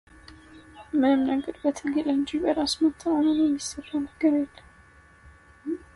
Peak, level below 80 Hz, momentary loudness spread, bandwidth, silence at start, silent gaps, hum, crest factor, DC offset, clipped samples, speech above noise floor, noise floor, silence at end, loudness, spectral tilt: -12 dBFS; -56 dBFS; 10 LU; 11.5 kHz; 0.3 s; none; none; 16 dB; under 0.1%; under 0.1%; 30 dB; -54 dBFS; 0.2 s; -25 LUFS; -4 dB/octave